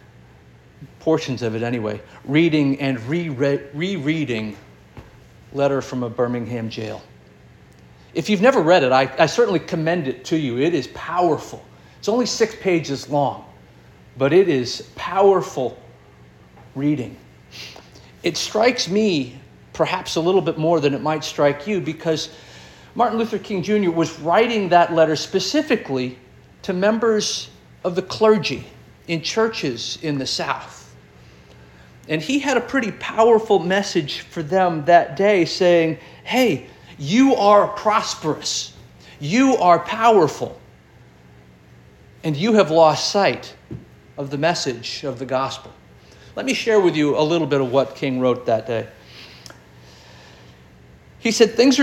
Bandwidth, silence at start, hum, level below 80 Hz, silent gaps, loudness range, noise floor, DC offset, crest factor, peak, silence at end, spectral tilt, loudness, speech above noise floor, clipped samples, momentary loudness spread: 16.5 kHz; 0.8 s; none; -56 dBFS; none; 7 LU; -48 dBFS; under 0.1%; 20 dB; 0 dBFS; 0 s; -5 dB/octave; -19 LUFS; 29 dB; under 0.1%; 15 LU